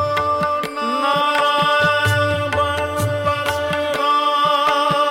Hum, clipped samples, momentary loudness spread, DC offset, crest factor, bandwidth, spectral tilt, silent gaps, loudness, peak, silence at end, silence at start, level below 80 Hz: none; under 0.1%; 5 LU; under 0.1%; 10 dB; 16.5 kHz; -4.5 dB/octave; none; -17 LUFS; -8 dBFS; 0 s; 0 s; -48 dBFS